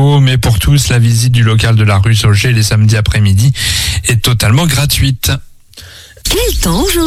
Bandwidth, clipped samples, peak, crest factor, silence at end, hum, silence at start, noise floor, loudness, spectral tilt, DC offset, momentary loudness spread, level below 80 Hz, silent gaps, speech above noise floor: 16.5 kHz; under 0.1%; 0 dBFS; 10 dB; 0 s; none; 0 s; -34 dBFS; -10 LUFS; -4.5 dB/octave; under 0.1%; 3 LU; -22 dBFS; none; 25 dB